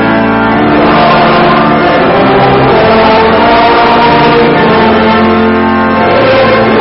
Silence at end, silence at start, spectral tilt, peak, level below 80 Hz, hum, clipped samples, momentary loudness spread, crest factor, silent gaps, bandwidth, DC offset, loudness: 0 s; 0 s; -9 dB/octave; 0 dBFS; -30 dBFS; none; under 0.1%; 3 LU; 6 dB; none; 5.8 kHz; under 0.1%; -6 LUFS